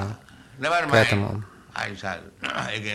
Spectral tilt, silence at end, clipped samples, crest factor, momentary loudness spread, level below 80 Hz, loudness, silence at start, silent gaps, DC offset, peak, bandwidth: -5 dB/octave; 0 s; under 0.1%; 22 dB; 16 LU; -56 dBFS; -24 LUFS; 0 s; none; under 0.1%; -4 dBFS; 14.5 kHz